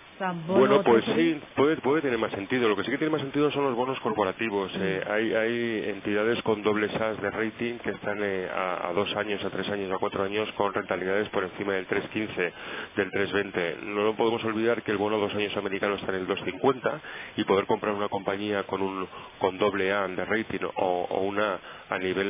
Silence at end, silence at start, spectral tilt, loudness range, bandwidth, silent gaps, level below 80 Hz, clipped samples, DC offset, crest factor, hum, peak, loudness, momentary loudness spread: 0 s; 0 s; -9.5 dB/octave; 3 LU; 3.8 kHz; none; -60 dBFS; under 0.1%; under 0.1%; 18 dB; none; -8 dBFS; -27 LUFS; 6 LU